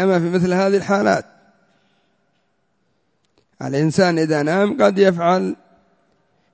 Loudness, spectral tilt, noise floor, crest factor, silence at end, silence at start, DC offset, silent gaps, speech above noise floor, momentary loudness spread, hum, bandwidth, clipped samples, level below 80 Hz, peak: -17 LUFS; -6.5 dB/octave; -67 dBFS; 18 dB; 1 s; 0 s; under 0.1%; none; 51 dB; 9 LU; none; 8 kHz; under 0.1%; -58 dBFS; -2 dBFS